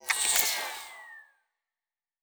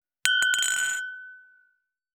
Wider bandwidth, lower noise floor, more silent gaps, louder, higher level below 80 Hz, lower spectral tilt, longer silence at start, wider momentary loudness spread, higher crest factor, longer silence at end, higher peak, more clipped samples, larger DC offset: about the same, over 20 kHz vs over 20 kHz; first, under -90 dBFS vs -71 dBFS; neither; second, -26 LUFS vs -23 LUFS; first, -70 dBFS vs -76 dBFS; about the same, 3 dB/octave vs 4 dB/octave; second, 0.05 s vs 0.25 s; first, 21 LU vs 15 LU; about the same, 24 dB vs 28 dB; first, 1 s vs 0.75 s; second, -10 dBFS vs 0 dBFS; neither; neither